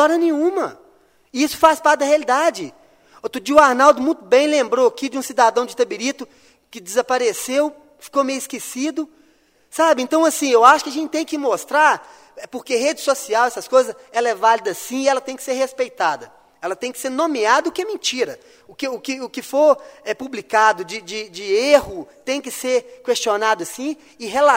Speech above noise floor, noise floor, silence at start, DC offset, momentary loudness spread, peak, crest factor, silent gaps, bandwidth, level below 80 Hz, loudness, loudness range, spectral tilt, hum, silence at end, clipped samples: 38 dB; -57 dBFS; 0 s; under 0.1%; 14 LU; 0 dBFS; 18 dB; none; 16 kHz; -60 dBFS; -18 LUFS; 5 LU; -2 dB/octave; none; 0 s; under 0.1%